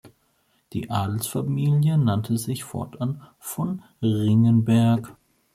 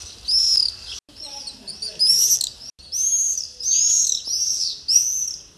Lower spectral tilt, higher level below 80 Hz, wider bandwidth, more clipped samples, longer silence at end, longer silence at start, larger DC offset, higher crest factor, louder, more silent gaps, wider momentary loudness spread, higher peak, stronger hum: first, -7 dB/octave vs 3 dB/octave; about the same, -60 dBFS vs -56 dBFS; first, 15.5 kHz vs 12 kHz; neither; first, 0.45 s vs 0.15 s; about the same, 0.05 s vs 0 s; neither; second, 14 dB vs 20 dB; second, -23 LUFS vs -17 LUFS; neither; second, 15 LU vs 18 LU; second, -8 dBFS vs -2 dBFS; neither